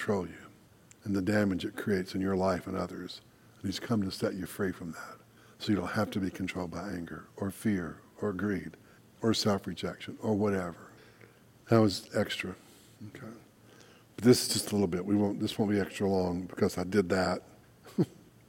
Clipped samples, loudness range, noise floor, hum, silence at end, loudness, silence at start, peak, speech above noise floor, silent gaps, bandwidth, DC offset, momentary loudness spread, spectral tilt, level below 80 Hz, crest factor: under 0.1%; 5 LU; -59 dBFS; none; 0.35 s; -32 LUFS; 0 s; -10 dBFS; 28 dB; none; 16.5 kHz; under 0.1%; 16 LU; -5.5 dB/octave; -64 dBFS; 22 dB